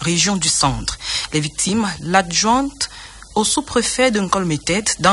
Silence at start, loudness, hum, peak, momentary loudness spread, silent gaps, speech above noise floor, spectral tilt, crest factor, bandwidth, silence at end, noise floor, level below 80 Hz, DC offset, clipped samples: 0 s; -18 LUFS; none; -2 dBFS; 8 LU; none; 20 dB; -3 dB/octave; 16 dB; 11.5 kHz; 0 s; -38 dBFS; -40 dBFS; under 0.1%; under 0.1%